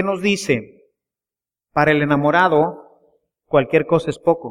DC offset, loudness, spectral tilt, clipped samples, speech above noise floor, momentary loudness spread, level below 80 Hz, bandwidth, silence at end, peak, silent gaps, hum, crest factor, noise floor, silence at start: under 0.1%; -18 LUFS; -6 dB/octave; under 0.1%; over 73 dB; 7 LU; -52 dBFS; 13.5 kHz; 0 s; 0 dBFS; none; none; 18 dB; under -90 dBFS; 0 s